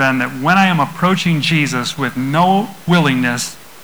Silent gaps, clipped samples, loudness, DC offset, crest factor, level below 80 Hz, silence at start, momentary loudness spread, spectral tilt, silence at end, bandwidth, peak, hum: none; under 0.1%; -15 LUFS; 0.9%; 12 dB; -54 dBFS; 0 s; 7 LU; -5 dB/octave; 0.2 s; over 20 kHz; -2 dBFS; none